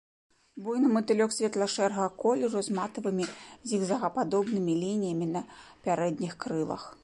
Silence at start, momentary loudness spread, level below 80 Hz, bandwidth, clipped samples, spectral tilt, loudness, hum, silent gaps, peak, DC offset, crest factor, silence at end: 0.55 s; 9 LU; -70 dBFS; 11.5 kHz; under 0.1%; -5.5 dB/octave; -30 LUFS; none; none; -14 dBFS; under 0.1%; 16 dB; 0.1 s